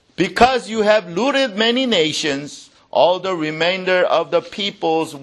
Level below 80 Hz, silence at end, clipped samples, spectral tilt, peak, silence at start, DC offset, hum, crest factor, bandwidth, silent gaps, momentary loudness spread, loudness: -50 dBFS; 0 s; under 0.1%; -4 dB/octave; 0 dBFS; 0.2 s; under 0.1%; none; 18 dB; 12.5 kHz; none; 7 LU; -17 LUFS